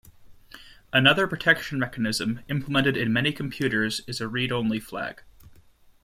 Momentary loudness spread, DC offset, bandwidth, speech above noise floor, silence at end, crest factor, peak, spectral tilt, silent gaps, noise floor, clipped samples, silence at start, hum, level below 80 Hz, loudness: 11 LU; under 0.1%; 16 kHz; 30 dB; 0.6 s; 24 dB; -2 dBFS; -4.5 dB/octave; none; -55 dBFS; under 0.1%; 0.05 s; none; -54 dBFS; -24 LUFS